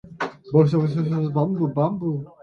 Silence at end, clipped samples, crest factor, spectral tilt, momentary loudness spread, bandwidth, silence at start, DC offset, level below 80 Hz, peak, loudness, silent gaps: 0.15 s; under 0.1%; 18 dB; -9.5 dB/octave; 10 LU; 6.6 kHz; 0.05 s; under 0.1%; -58 dBFS; -4 dBFS; -22 LUFS; none